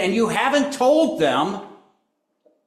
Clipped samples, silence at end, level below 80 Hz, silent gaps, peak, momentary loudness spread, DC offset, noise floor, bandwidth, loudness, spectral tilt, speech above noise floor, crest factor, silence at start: under 0.1%; 0.9 s; -64 dBFS; none; -6 dBFS; 7 LU; under 0.1%; -71 dBFS; 14 kHz; -19 LUFS; -4.5 dB/octave; 52 dB; 14 dB; 0 s